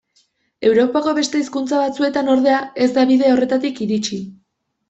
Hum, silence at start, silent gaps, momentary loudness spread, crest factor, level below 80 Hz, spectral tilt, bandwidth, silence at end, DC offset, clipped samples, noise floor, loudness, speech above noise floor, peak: none; 0.6 s; none; 7 LU; 14 dB; -60 dBFS; -4.5 dB/octave; 8.2 kHz; 0.55 s; under 0.1%; under 0.1%; -69 dBFS; -17 LUFS; 52 dB; -4 dBFS